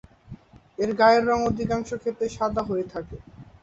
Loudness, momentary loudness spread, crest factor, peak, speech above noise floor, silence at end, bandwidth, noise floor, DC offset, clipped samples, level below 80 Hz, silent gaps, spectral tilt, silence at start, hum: -24 LUFS; 20 LU; 20 dB; -6 dBFS; 22 dB; 0.2 s; 8 kHz; -46 dBFS; under 0.1%; under 0.1%; -48 dBFS; none; -6 dB/octave; 0.3 s; none